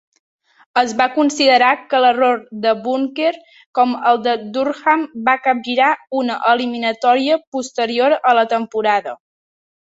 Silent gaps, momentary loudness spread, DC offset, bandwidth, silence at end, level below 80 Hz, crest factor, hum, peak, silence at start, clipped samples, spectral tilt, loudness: 3.66-3.73 s, 7.47-7.52 s; 7 LU; under 0.1%; 8 kHz; 0.65 s; -66 dBFS; 16 dB; none; 0 dBFS; 0.75 s; under 0.1%; -3 dB/octave; -16 LUFS